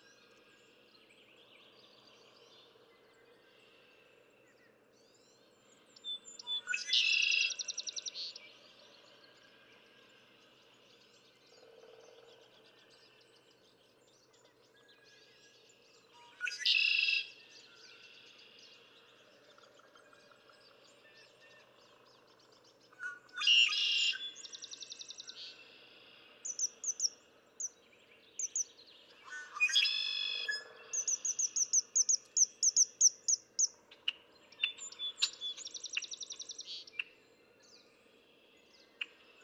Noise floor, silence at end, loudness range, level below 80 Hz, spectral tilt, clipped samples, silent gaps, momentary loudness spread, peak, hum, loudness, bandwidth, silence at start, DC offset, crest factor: -67 dBFS; 0.4 s; 15 LU; under -90 dBFS; 4.5 dB/octave; under 0.1%; none; 22 LU; -16 dBFS; none; -32 LUFS; 15.5 kHz; 6.05 s; under 0.1%; 24 dB